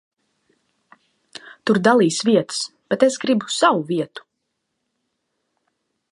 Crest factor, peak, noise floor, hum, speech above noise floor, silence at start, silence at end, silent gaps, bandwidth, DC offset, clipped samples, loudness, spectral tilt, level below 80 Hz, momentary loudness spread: 20 dB; -2 dBFS; -76 dBFS; none; 58 dB; 1.45 s; 1.95 s; none; 11.5 kHz; under 0.1%; under 0.1%; -19 LUFS; -4.5 dB/octave; -70 dBFS; 16 LU